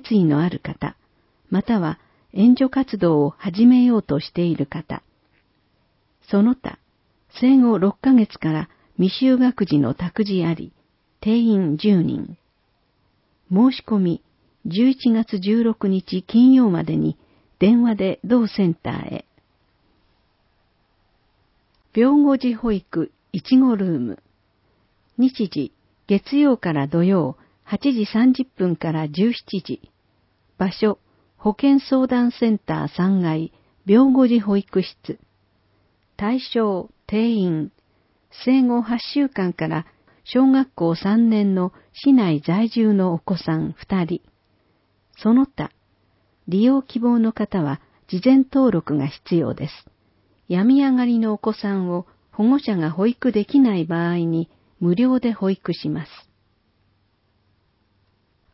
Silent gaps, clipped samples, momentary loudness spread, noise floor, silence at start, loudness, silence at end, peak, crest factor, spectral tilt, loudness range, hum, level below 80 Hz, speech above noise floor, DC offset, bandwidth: none; under 0.1%; 14 LU; -65 dBFS; 0.05 s; -19 LUFS; 2.5 s; -4 dBFS; 16 dB; -12 dB/octave; 6 LU; none; -54 dBFS; 47 dB; under 0.1%; 5.8 kHz